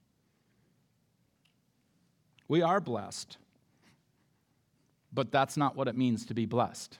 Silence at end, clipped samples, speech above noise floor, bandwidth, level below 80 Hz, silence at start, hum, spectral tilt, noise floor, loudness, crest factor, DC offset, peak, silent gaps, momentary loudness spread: 0.05 s; under 0.1%; 42 dB; 16.5 kHz; -82 dBFS; 2.5 s; none; -6 dB/octave; -73 dBFS; -31 LUFS; 22 dB; under 0.1%; -12 dBFS; none; 12 LU